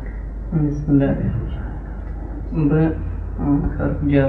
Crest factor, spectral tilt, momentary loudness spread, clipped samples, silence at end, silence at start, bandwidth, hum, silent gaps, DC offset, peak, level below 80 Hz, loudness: 16 dB; -10.5 dB/octave; 14 LU; under 0.1%; 0 s; 0 s; 6 kHz; none; none; under 0.1%; -4 dBFS; -28 dBFS; -21 LUFS